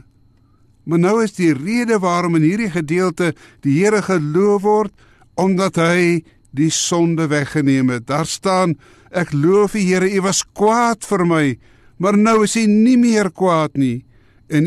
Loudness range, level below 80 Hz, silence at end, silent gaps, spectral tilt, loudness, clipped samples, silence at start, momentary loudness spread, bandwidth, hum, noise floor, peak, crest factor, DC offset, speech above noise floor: 2 LU; -52 dBFS; 0 s; none; -5.5 dB/octave; -16 LUFS; under 0.1%; 0.85 s; 8 LU; 13 kHz; none; -53 dBFS; -4 dBFS; 12 dB; under 0.1%; 37 dB